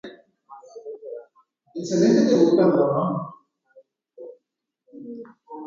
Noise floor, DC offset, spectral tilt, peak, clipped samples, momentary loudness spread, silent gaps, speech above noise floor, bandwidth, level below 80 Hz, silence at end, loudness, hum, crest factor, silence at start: -79 dBFS; under 0.1%; -7 dB/octave; -6 dBFS; under 0.1%; 26 LU; none; 60 dB; 7.6 kHz; -70 dBFS; 0 s; -19 LUFS; none; 18 dB; 0.05 s